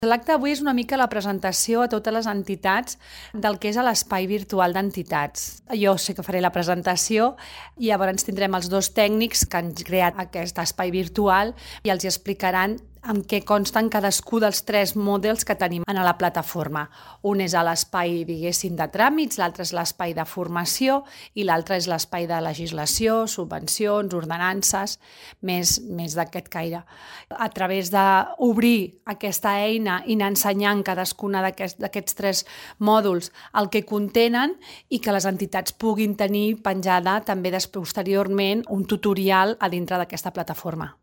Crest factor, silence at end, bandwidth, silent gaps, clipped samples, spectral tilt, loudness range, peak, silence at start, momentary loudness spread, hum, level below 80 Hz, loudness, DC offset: 20 dB; 0.1 s; 17 kHz; none; under 0.1%; -3.5 dB/octave; 2 LU; -4 dBFS; 0 s; 9 LU; none; -50 dBFS; -23 LUFS; under 0.1%